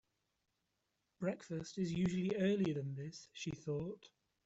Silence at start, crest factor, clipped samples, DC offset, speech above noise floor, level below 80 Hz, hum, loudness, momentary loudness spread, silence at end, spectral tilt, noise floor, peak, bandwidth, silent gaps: 1.2 s; 16 dB; under 0.1%; under 0.1%; 46 dB; -70 dBFS; none; -40 LUFS; 12 LU; 0.4 s; -6.5 dB/octave; -86 dBFS; -26 dBFS; 8 kHz; none